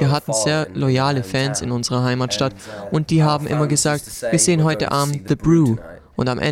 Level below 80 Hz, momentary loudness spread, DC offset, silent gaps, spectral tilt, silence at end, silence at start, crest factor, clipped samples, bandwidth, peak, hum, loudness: -46 dBFS; 8 LU; under 0.1%; none; -5 dB/octave; 0 s; 0 s; 14 dB; under 0.1%; 15.5 kHz; -4 dBFS; none; -19 LUFS